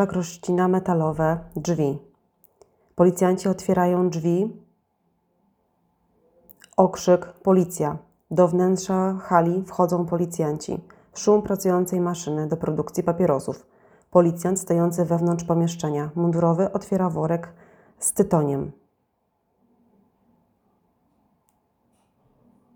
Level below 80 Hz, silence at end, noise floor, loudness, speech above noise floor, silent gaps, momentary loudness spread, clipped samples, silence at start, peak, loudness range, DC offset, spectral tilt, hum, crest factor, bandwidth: -58 dBFS; 4.05 s; -72 dBFS; -23 LUFS; 50 dB; none; 8 LU; under 0.1%; 0 s; -2 dBFS; 5 LU; under 0.1%; -7 dB/octave; none; 22 dB; 19 kHz